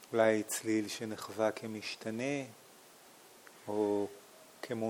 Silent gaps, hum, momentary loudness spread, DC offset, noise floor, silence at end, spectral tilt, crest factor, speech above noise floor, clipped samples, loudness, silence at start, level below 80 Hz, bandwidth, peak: none; none; 26 LU; under 0.1%; -58 dBFS; 0 s; -4.5 dB/octave; 20 dB; 24 dB; under 0.1%; -35 LUFS; 0 s; -84 dBFS; 19.5 kHz; -16 dBFS